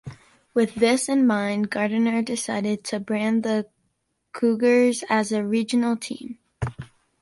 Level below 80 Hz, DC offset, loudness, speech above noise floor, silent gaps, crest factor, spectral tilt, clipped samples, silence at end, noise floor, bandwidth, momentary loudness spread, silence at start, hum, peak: -54 dBFS; under 0.1%; -23 LUFS; 51 dB; none; 18 dB; -5 dB/octave; under 0.1%; 0.35 s; -73 dBFS; 11.5 kHz; 13 LU; 0.05 s; none; -6 dBFS